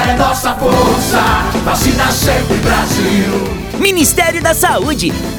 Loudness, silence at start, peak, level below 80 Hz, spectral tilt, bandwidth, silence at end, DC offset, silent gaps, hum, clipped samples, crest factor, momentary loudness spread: -12 LUFS; 0 s; 0 dBFS; -24 dBFS; -4 dB/octave; over 20 kHz; 0 s; under 0.1%; none; none; under 0.1%; 12 dB; 4 LU